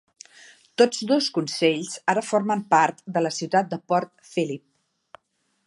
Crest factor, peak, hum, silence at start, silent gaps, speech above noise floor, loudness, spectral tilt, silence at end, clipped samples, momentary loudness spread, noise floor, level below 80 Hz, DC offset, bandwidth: 20 dB; -4 dBFS; none; 0.8 s; none; 49 dB; -23 LUFS; -4 dB/octave; 1.1 s; under 0.1%; 8 LU; -72 dBFS; -76 dBFS; under 0.1%; 11.5 kHz